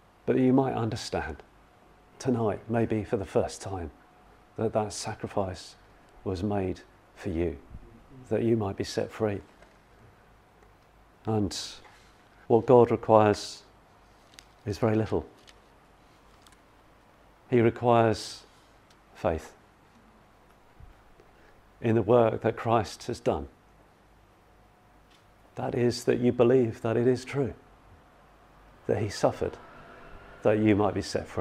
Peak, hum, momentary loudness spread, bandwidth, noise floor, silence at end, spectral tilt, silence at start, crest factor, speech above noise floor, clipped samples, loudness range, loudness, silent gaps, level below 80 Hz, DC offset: -4 dBFS; none; 18 LU; 14 kHz; -59 dBFS; 0 s; -6.5 dB/octave; 0.25 s; 26 dB; 32 dB; under 0.1%; 9 LU; -27 LUFS; none; -56 dBFS; under 0.1%